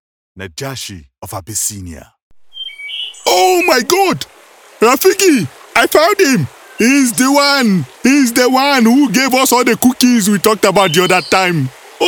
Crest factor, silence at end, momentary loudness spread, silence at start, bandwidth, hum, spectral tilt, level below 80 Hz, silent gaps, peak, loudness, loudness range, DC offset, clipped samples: 12 dB; 0 s; 16 LU; 0.35 s; 19 kHz; none; -3.5 dB/octave; -52 dBFS; 2.22-2.31 s; 0 dBFS; -11 LUFS; 6 LU; under 0.1%; 0.1%